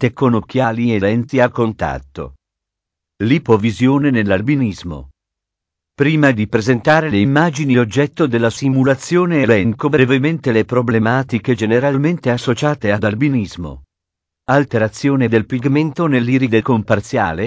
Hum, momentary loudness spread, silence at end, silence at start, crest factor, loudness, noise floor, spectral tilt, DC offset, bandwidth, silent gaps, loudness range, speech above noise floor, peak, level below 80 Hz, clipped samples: none; 7 LU; 0 s; 0 s; 16 dB; -15 LUFS; -82 dBFS; -7 dB/octave; under 0.1%; 8 kHz; none; 3 LU; 67 dB; 0 dBFS; -42 dBFS; under 0.1%